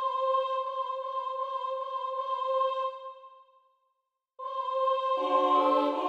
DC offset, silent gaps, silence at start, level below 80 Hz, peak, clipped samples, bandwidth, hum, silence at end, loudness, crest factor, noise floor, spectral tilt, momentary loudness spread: under 0.1%; none; 0 s; under -90 dBFS; -14 dBFS; under 0.1%; 7.8 kHz; none; 0 s; -29 LUFS; 18 dB; -81 dBFS; -3 dB/octave; 11 LU